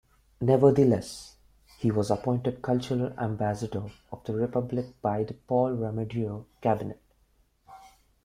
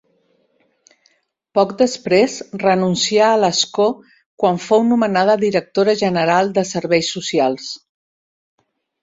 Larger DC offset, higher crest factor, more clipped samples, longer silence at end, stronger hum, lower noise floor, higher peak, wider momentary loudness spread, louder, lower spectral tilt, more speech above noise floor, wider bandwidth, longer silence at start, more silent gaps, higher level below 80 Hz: neither; first, 22 dB vs 16 dB; neither; second, 0.35 s vs 1.25 s; neither; first, -66 dBFS vs -62 dBFS; second, -6 dBFS vs -2 dBFS; first, 14 LU vs 6 LU; second, -28 LUFS vs -16 LUFS; first, -8 dB/octave vs -4.5 dB/octave; second, 39 dB vs 46 dB; first, 13.5 kHz vs 8 kHz; second, 0.4 s vs 1.55 s; second, none vs 4.26-4.38 s; about the same, -58 dBFS vs -60 dBFS